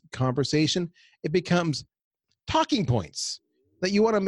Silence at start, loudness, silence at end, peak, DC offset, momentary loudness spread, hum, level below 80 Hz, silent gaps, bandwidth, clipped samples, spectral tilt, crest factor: 0.15 s; -26 LUFS; 0 s; -10 dBFS; under 0.1%; 12 LU; none; -54 dBFS; 2.04-2.11 s; 11.5 kHz; under 0.1%; -5 dB/octave; 16 dB